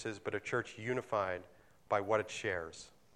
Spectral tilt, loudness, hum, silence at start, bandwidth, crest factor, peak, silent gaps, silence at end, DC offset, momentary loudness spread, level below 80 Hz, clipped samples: -4.5 dB/octave; -37 LUFS; none; 0 s; 13 kHz; 20 dB; -18 dBFS; none; 0.25 s; under 0.1%; 9 LU; -70 dBFS; under 0.1%